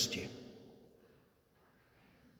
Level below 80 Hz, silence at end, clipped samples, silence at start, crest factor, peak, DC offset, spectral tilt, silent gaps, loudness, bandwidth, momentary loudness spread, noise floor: -72 dBFS; 0.1 s; under 0.1%; 0 s; 26 dB; -20 dBFS; under 0.1%; -2 dB/octave; none; -42 LUFS; over 20 kHz; 27 LU; -71 dBFS